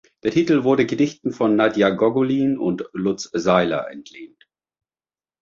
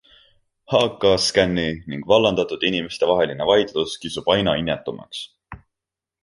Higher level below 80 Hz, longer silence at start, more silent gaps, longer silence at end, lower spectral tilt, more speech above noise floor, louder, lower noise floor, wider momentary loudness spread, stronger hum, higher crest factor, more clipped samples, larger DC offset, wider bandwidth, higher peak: second, -58 dBFS vs -48 dBFS; second, 0.25 s vs 0.7 s; neither; first, 1.15 s vs 0.65 s; first, -6 dB/octave vs -4.5 dB/octave; first, over 71 dB vs 67 dB; about the same, -20 LUFS vs -20 LUFS; about the same, under -90 dBFS vs -87 dBFS; second, 7 LU vs 14 LU; neither; about the same, 18 dB vs 20 dB; neither; neither; second, 7.6 kHz vs 11.5 kHz; about the same, -2 dBFS vs -2 dBFS